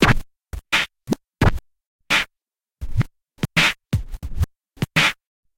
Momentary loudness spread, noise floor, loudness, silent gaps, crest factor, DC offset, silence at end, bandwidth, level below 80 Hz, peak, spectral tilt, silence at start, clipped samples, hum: 18 LU; -85 dBFS; -22 LUFS; 1.86-1.99 s; 20 dB; under 0.1%; 0.45 s; 17 kHz; -32 dBFS; -2 dBFS; -4 dB/octave; 0 s; under 0.1%; none